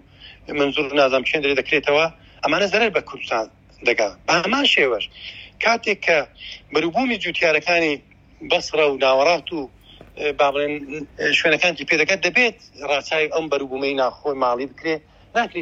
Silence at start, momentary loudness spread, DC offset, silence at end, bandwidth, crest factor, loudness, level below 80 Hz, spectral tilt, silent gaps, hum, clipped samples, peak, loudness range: 0.2 s; 11 LU; under 0.1%; 0 s; 8 kHz; 16 dB; -20 LUFS; -54 dBFS; -3 dB/octave; none; none; under 0.1%; -4 dBFS; 1 LU